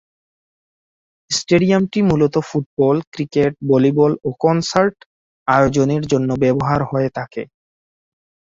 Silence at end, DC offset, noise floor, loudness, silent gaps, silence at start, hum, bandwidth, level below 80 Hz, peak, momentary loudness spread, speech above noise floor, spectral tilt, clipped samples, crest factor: 1 s; under 0.1%; under -90 dBFS; -17 LUFS; 2.66-2.77 s, 3.07-3.12 s, 5.06-5.46 s; 1.3 s; none; 8 kHz; -48 dBFS; -2 dBFS; 8 LU; over 74 dB; -6 dB/octave; under 0.1%; 16 dB